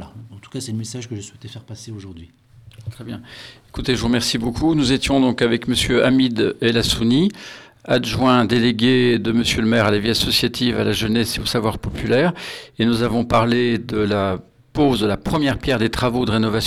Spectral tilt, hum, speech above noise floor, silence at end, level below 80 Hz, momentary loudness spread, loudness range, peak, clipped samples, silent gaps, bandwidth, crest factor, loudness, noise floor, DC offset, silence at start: -5 dB/octave; none; 20 dB; 0 s; -40 dBFS; 18 LU; 9 LU; -2 dBFS; under 0.1%; none; 15 kHz; 18 dB; -18 LUFS; -39 dBFS; under 0.1%; 0 s